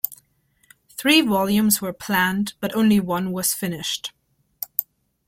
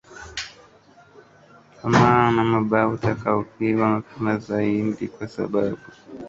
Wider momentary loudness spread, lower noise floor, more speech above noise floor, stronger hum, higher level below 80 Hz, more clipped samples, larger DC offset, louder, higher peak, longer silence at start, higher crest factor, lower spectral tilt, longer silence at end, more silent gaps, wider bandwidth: second, 12 LU vs 16 LU; first, -64 dBFS vs -52 dBFS; first, 43 dB vs 31 dB; neither; second, -58 dBFS vs -52 dBFS; neither; neither; about the same, -21 LUFS vs -22 LUFS; about the same, 0 dBFS vs -2 dBFS; about the same, 0.05 s vs 0.1 s; about the same, 22 dB vs 20 dB; second, -3.5 dB/octave vs -7 dB/octave; first, 0.45 s vs 0 s; neither; first, 16.5 kHz vs 7.8 kHz